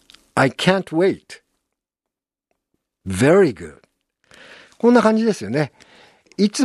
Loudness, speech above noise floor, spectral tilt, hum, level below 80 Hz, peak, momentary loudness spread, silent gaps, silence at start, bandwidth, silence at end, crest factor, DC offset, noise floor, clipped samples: -18 LUFS; 69 dB; -5.5 dB/octave; none; -60 dBFS; 0 dBFS; 19 LU; none; 0.35 s; 12.5 kHz; 0 s; 20 dB; under 0.1%; -86 dBFS; under 0.1%